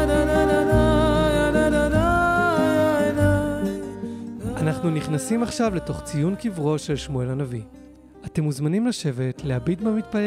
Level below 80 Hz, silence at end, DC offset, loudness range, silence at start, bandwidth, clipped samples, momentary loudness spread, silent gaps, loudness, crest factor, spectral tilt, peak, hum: -34 dBFS; 0 s; under 0.1%; 7 LU; 0 s; 15.5 kHz; under 0.1%; 11 LU; none; -22 LUFS; 14 dB; -6.5 dB/octave; -6 dBFS; none